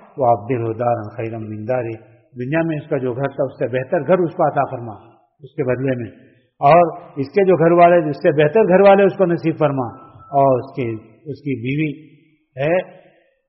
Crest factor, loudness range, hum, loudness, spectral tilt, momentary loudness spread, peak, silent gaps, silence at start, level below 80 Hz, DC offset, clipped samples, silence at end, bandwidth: 16 dB; 8 LU; none; -17 LUFS; -6.5 dB/octave; 17 LU; -2 dBFS; none; 0.15 s; -58 dBFS; under 0.1%; under 0.1%; 0.6 s; 5.8 kHz